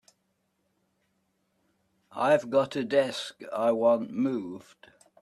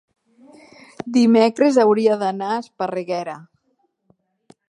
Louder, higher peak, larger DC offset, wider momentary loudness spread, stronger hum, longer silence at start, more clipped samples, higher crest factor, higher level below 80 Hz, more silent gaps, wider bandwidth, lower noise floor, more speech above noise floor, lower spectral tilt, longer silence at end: second, -27 LUFS vs -18 LUFS; second, -10 dBFS vs -2 dBFS; neither; about the same, 14 LU vs 14 LU; neither; first, 2.15 s vs 1.05 s; neither; about the same, 20 dB vs 18 dB; about the same, -76 dBFS vs -72 dBFS; neither; first, 12 kHz vs 10.5 kHz; first, -76 dBFS vs -68 dBFS; about the same, 49 dB vs 50 dB; about the same, -5.5 dB/octave vs -6 dB/octave; second, 0.6 s vs 1.3 s